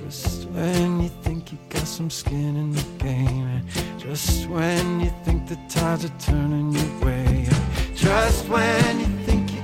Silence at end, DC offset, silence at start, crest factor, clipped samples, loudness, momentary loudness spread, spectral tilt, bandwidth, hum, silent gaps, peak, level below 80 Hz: 0 s; under 0.1%; 0 s; 14 dB; under 0.1%; -23 LUFS; 8 LU; -5.5 dB/octave; 16.5 kHz; none; none; -8 dBFS; -30 dBFS